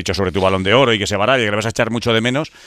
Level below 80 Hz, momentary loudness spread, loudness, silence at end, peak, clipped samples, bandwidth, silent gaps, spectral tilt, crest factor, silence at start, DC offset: -44 dBFS; 6 LU; -16 LUFS; 0.2 s; -2 dBFS; under 0.1%; 15 kHz; none; -4.5 dB/octave; 16 dB; 0 s; under 0.1%